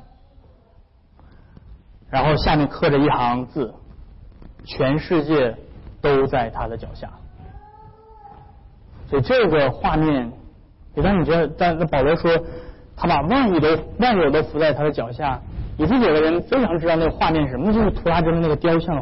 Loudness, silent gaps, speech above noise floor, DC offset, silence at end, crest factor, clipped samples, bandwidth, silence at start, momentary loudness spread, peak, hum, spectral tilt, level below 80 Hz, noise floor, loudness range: -19 LUFS; none; 33 dB; 0.7%; 0 s; 12 dB; under 0.1%; 5.8 kHz; 0 s; 12 LU; -10 dBFS; none; -11.5 dB/octave; -36 dBFS; -52 dBFS; 5 LU